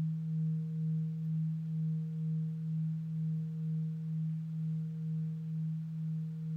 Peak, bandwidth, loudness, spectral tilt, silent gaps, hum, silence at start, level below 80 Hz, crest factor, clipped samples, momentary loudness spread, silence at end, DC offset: -28 dBFS; 1.6 kHz; -37 LUFS; -11 dB/octave; none; none; 0 s; -74 dBFS; 6 dB; under 0.1%; 3 LU; 0 s; under 0.1%